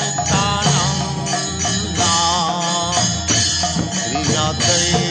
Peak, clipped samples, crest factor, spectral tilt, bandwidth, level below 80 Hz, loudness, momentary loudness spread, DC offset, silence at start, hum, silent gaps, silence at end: -2 dBFS; under 0.1%; 16 dB; -3 dB/octave; 9.2 kHz; -38 dBFS; -16 LUFS; 5 LU; under 0.1%; 0 s; none; none; 0 s